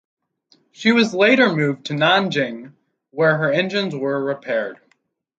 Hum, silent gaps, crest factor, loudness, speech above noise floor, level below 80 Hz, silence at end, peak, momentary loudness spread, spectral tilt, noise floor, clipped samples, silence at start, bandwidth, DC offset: none; none; 18 dB; -18 LUFS; 47 dB; -68 dBFS; 0.65 s; -2 dBFS; 10 LU; -5.5 dB/octave; -65 dBFS; under 0.1%; 0.8 s; 7.8 kHz; under 0.1%